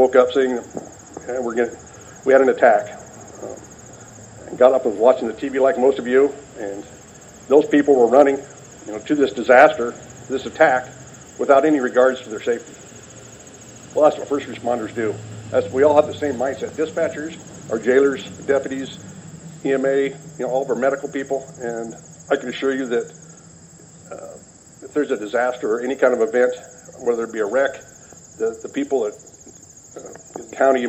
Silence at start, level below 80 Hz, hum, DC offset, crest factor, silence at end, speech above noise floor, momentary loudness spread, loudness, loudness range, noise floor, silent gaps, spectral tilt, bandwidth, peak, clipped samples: 0 s; -58 dBFS; none; under 0.1%; 20 dB; 0 s; 26 dB; 23 LU; -19 LUFS; 8 LU; -44 dBFS; none; -5 dB/octave; 8.6 kHz; 0 dBFS; under 0.1%